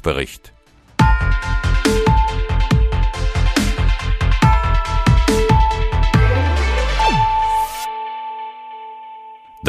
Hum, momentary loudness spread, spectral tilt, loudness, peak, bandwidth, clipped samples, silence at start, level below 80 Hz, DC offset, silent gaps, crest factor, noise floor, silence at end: none; 14 LU; -5.5 dB/octave; -17 LUFS; -2 dBFS; 14.5 kHz; under 0.1%; 0.05 s; -20 dBFS; under 0.1%; none; 14 dB; -38 dBFS; 0 s